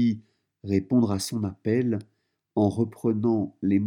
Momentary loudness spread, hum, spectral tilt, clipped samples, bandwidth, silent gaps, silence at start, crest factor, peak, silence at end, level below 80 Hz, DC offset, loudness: 9 LU; none; -7 dB/octave; under 0.1%; 18 kHz; none; 0 s; 16 dB; -10 dBFS; 0 s; -64 dBFS; under 0.1%; -26 LUFS